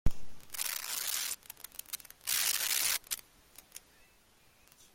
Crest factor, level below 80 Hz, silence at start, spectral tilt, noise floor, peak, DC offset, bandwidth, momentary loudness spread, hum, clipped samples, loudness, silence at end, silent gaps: 22 dB; -48 dBFS; 0.05 s; 0 dB/octave; -65 dBFS; -14 dBFS; under 0.1%; 17 kHz; 20 LU; none; under 0.1%; -33 LUFS; 1.15 s; none